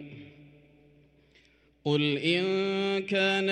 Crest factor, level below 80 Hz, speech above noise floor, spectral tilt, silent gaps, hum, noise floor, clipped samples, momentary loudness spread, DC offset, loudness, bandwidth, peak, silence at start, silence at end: 18 dB; -70 dBFS; 36 dB; -5.5 dB/octave; none; none; -63 dBFS; under 0.1%; 13 LU; under 0.1%; -27 LUFS; 9.6 kHz; -12 dBFS; 0 s; 0 s